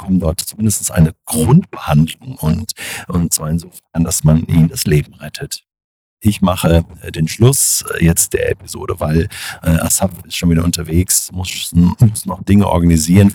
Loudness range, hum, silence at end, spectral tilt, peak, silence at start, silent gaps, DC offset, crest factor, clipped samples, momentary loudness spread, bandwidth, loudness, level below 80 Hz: 2 LU; none; 0 s; -5 dB/octave; 0 dBFS; 0 s; 5.84-6.17 s; under 0.1%; 14 dB; under 0.1%; 11 LU; 19.5 kHz; -14 LUFS; -30 dBFS